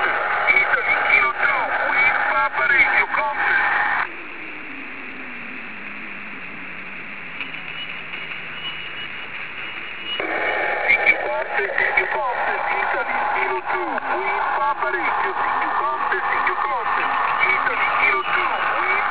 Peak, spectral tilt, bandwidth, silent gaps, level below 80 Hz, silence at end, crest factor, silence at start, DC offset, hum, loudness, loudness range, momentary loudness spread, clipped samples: -2 dBFS; 0.5 dB/octave; 4 kHz; none; -56 dBFS; 0 s; 18 dB; 0 s; 1%; none; -19 LUFS; 13 LU; 16 LU; under 0.1%